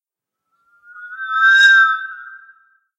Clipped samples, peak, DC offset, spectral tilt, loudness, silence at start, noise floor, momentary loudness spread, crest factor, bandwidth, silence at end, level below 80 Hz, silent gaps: under 0.1%; -2 dBFS; under 0.1%; 7 dB/octave; -11 LUFS; 1 s; -81 dBFS; 25 LU; 16 dB; 9.2 kHz; 0.6 s; under -90 dBFS; none